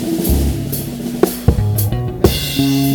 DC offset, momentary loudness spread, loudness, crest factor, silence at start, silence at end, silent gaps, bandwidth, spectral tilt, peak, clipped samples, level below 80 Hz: under 0.1%; 6 LU; -17 LUFS; 16 dB; 0 s; 0 s; none; over 20 kHz; -5.5 dB/octave; 0 dBFS; 0.2%; -24 dBFS